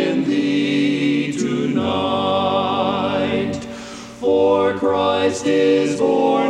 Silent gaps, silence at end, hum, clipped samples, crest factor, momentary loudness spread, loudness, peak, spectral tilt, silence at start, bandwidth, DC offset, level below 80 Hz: none; 0 s; none; under 0.1%; 14 dB; 7 LU; -18 LUFS; -4 dBFS; -5.5 dB/octave; 0 s; 10.5 kHz; under 0.1%; -54 dBFS